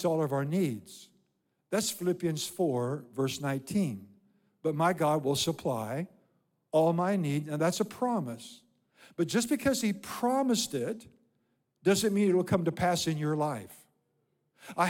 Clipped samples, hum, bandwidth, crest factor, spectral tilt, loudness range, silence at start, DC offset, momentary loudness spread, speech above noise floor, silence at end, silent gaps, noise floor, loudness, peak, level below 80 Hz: under 0.1%; none; 17.5 kHz; 18 dB; -5 dB/octave; 3 LU; 0 s; under 0.1%; 14 LU; 47 dB; 0 s; none; -77 dBFS; -30 LUFS; -14 dBFS; -68 dBFS